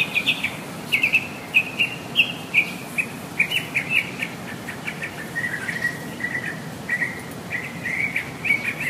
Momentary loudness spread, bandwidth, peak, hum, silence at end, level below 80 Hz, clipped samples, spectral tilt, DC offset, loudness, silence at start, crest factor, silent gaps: 11 LU; 15.5 kHz; -6 dBFS; none; 0 s; -58 dBFS; under 0.1%; -3 dB/octave; under 0.1%; -23 LUFS; 0 s; 20 dB; none